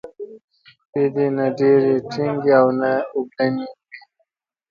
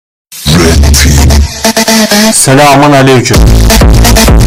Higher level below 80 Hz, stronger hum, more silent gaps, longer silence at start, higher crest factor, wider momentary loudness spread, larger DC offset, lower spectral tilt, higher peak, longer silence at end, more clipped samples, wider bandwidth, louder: second, -66 dBFS vs -8 dBFS; neither; first, 0.44-0.48 s, 0.85-0.93 s vs none; second, 0.05 s vs 0.3 s; first, 20 dB vs 4 dB; first, 17 LU vs 5 LU; neither; first, -8 dB/octave vs -4 dB/octave; about the same, 0 dBFS vs 0 dBFS; first, 0.7 s vs 0 s; second, under 0.1% vs 3%; second, 7 kHz vs 18 kHz; second, -19 LUFS vs -4 LUFS